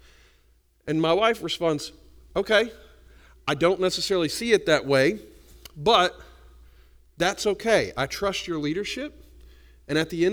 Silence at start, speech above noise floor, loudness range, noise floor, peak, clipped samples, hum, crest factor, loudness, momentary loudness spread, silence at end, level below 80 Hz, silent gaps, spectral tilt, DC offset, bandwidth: 0.85 s; 38 dB; 4 LU; -61 dBFS; -4 dBFS; under 0.1%; none; 22 dB; -24 LUFS; 11 LU; 0 s; -52 dBFS; none; -4 dB/octave; under 0.1%; over 20 kHz